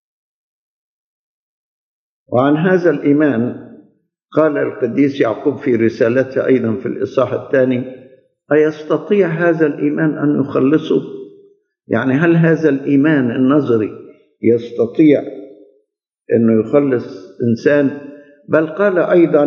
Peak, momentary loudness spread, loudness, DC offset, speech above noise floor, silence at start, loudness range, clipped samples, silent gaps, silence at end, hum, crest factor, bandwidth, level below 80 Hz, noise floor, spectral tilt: 0 dBFS; 8 LU; -15 LUFS; under 0.1%; 53 dB; 2.3 s; 3 LU; under 0.1%; none; 0 s; none; 16 dB; 6.6 kHz; -68 dBFS; -67 dBFS; -9 dB/octave